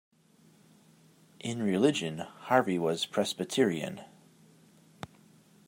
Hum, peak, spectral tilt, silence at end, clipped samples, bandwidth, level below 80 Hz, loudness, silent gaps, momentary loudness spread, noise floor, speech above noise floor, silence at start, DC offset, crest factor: none; -10 dBFS; -5 dB/octave; 1.6 s; under 0.1%; 16 kHz; -76 dBFS; -30 LUFS; none; 21 LU; -62 dBFS; 33 dB; 1.45 s; under 0.1%; 24 dB